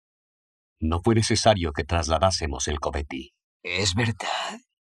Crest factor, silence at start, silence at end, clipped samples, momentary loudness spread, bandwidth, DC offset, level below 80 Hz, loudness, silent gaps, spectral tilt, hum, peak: 22 dB; 0.8 s; 0.35 s; under 0.1%; 14 LU; 12 kHz; under 0.1%; -40 dBFS; -24 LUFS; 3.44-3.60 s; -4.5 dB/octave; none; -4 dBFS